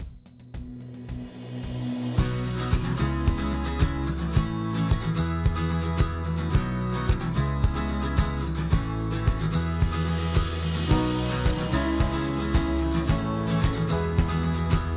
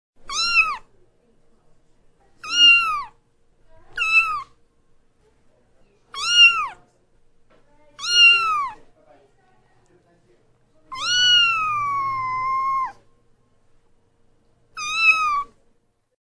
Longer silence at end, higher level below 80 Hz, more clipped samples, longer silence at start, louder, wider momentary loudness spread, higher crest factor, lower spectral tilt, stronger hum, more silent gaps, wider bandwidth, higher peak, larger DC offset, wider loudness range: second, 0 s vs 0.8 s; first, -30 dBFS vs -54 dBFS; neither; second, 0 s vs 0.25 s; second, -27 LUFS vs -16 LUFS; second, 7 LU vs 20 LU; second, 14 dB vs 20 dB; first, -11.5 dB/octave vs 2 dB/octave; neither; neither; second, 4 kHz vs 11 kHz; second, -12 dBFS vs -4 dBFS; neither; second, 2 LU vs 7 LU